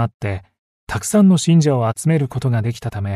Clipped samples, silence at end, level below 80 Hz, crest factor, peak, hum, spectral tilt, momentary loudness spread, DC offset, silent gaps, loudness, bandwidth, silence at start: under 0.1%; 0 s; -48 dBFS; 12 dB; -4 dBFS; none; -6.5 dB/octave; 13 LU; under 0.1%; 0.14-0.20 s, 0.58-0.87 s; -17 LUFS; 13.5 kHz; 0 s